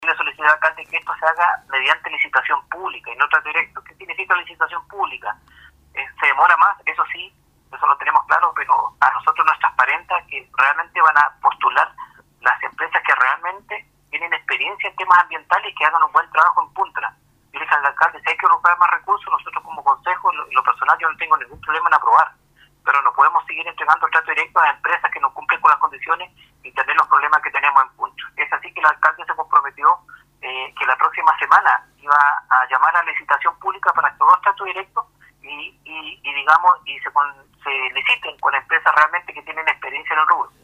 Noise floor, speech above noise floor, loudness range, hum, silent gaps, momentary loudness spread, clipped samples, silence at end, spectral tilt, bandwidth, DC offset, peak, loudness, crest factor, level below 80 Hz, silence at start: -55 dBFS; 36 dB; 3 LU; none; none; 13 LU; under 0.1%; 0.15 s; -2 dB/octave; 10 kHz; under 0.1%; 0 dBFS; -17 LUFS; 18 dB; -62 dBFS; 0 s